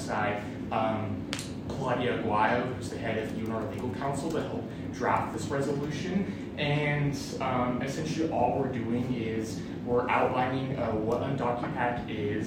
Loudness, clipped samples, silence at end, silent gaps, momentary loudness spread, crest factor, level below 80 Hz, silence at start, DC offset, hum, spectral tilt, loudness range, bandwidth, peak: -30 LUFS; under 0.1%; 0 s; none; 7 LU; 20 dB; -54 dBFS; 0 s; under 0.1%; none; -6 dB/octave; 2 LU; 16 kHz; -10 dBFS